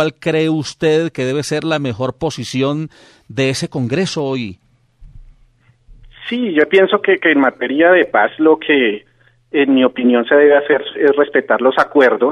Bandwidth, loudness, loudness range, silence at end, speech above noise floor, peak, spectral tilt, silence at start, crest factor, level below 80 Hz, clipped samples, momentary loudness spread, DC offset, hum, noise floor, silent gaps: 12 kHz; -14 LUFS; 9 LU; 0 s; 38 dB; 0 dBFS; -5.5 dB/octave; 0 s; 14 dB; -50 dBFS; under 0.1%; 10 LU; under 0.1%; none; -52 dBFS; none